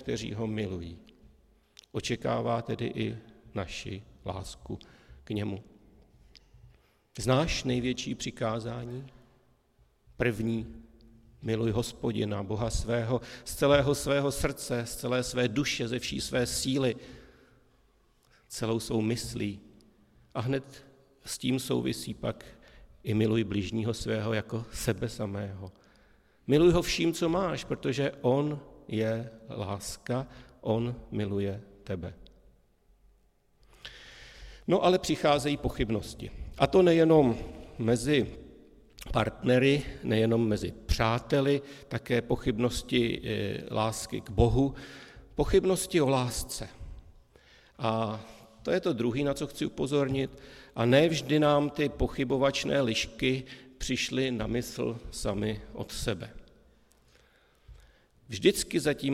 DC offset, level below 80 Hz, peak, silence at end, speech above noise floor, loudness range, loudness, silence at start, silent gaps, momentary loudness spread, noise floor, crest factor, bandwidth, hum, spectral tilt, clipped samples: under 0.1%; -46 dBFS; -8 dBFS; 0 s; 37 dB; 9 LU; -30 LUFS; 0 s; none; 17 LU; -66 dBFS; 22 dB; 16 kHz; none; -5.5 dB/octave; under 0.1%